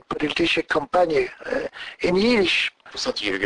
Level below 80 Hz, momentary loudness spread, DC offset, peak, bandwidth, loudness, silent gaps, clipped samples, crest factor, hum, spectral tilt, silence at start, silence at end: -50 dBFS; 10 LU; under 0.1%; -8 dBFS; 10.5 kHz; -22 LUFS; none; under 0.1%; 14 dB; none; -4 dB/octave; 0.1 s; 0 s